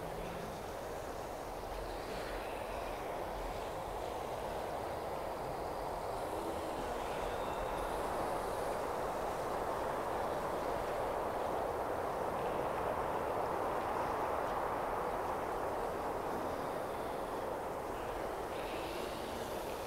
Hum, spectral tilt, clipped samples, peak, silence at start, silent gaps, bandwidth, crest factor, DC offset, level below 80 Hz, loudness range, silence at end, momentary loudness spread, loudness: none; -5 dB/octave; under 0.1%; -24 dBFS; 0 s; none; 16 kHz; 14 dB; under 0.1%; -54 dBFS; 4 LU; 0 s; 5 LU; -39 LUFS